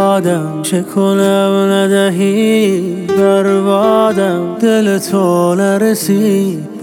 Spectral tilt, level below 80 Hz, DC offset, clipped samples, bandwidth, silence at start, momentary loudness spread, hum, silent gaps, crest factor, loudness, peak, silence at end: -5.5 dB/octave; -62 dBFS; under 0.1%; under 0.1%; 17.5 kHz; 0 s; 5 LU; none; none; 12 dB; -12 LUFS; 0 dBFS; 0 s